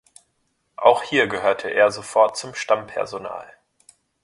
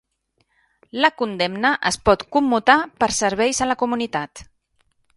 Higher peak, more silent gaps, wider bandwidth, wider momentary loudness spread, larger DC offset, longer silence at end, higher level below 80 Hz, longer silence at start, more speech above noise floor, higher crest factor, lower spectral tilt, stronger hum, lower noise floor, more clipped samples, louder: about the same, 0 dBFS vs 0 dBFS; neither; about the same, 11.5 kHz vs 11.5 kHz; first, 12 LU vs 8 LU; neither; about the same, 0.8 s vs 0.75 s; second, -64 dBFS vs -46 dBFS; second, 0.8 s vs 0.95 s; about the same, 50 dB vs 49 dB; about the same, 22 dB vs 20 dB; about the same, -3 dB/octave vs -3 dB/octave; neither; about the same, -70 dBFS vs -68 dBFS; neither; about the same, -20 LUFS vs -19 LUFS